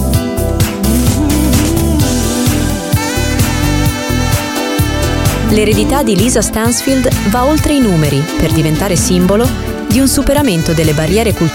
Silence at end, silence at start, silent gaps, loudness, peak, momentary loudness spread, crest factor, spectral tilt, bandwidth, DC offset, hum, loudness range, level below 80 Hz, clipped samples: 0 s; 0 s; none; -12 LUFS; 0 dBFS; 4 LU; 12 dB; -5 dB/octave; 17.5 kHz; under 0.1%; none; 2 LU; -22 dBFS; under 0.1%